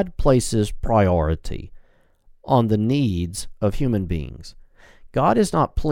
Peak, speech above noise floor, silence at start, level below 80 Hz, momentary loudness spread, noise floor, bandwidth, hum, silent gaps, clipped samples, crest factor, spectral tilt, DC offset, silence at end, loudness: -4 dBFS; 34 dB; 0 s; -32 dBFS; 11 LU; -53 dBFS; 16.5 kHz; none; none; under 0.1%; 18 dB; -6.5 dB/octave; under 0.1%; 0 s; -21 LUFS